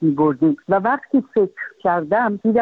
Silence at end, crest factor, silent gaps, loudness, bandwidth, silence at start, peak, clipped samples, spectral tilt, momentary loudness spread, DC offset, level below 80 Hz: 0 s; 14 dB; none; -19 LUFS; 4.2 kHz; 0 s; -4 dBFS; under 0.1%; -10.5 dB/octave; 4 LU; under 0.1%; -60 dBFS